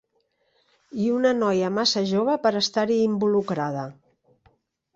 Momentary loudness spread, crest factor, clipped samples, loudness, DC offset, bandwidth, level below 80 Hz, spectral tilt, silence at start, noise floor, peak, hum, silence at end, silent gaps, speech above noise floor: 8 LU; 18 dB; under 0.1%; -23 LUFS; under 0.1%; 7.8 kHz; -68 dBFS; -5 dB/octave; 0.95 s; -70 dBFS; -8 dBFS; none; 1.05 s; none; 48 dB